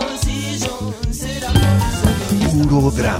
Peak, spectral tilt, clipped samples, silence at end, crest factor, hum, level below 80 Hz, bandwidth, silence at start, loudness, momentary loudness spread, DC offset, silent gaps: -2 dBFS; -5.5 dB/octave; under 0.1%; 0 s; 16 dB; none; -26 dBFS; 16 kHz; 0 s; -18 LUFS; 9 LU; under 0.1%; none